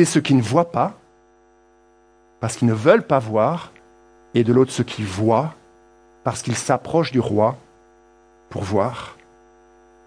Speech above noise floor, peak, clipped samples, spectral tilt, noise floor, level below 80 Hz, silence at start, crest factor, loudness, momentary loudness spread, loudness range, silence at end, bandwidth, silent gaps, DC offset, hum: 36 dB; -2 dBFS; under 0.1%; -6 dB/octave; -55 dBFS; -58 dBFS; 0 s; 20 dB; -20 LUFS; 14 LU; 4 LU; 0.95 s; 10.5 kHz; none; under 0.1%; none